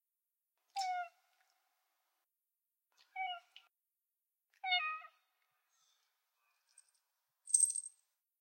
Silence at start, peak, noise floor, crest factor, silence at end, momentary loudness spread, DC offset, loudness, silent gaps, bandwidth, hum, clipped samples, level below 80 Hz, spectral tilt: 0.75 s; -16 dBFS; under -90 dBFS; 30 dB; 0.5 s; 20 LU; under 0.1%; -36 LUFS; none; 16 kHz; none; under 0.1%; under -90 dBFS; 8 dB/octave